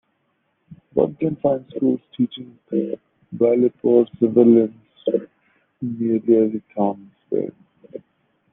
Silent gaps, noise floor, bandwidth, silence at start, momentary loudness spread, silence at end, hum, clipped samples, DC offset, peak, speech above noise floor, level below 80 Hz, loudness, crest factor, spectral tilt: none; -69 dBFS; 3.8 kHz; 0.7 s; 18 LU; 0.55 s; none; under 0.1%; under 0.1%; -2 dBFS; 50 dB; -64 dBFS; -20 LUFS; 18 dB; -11.5 dB/octave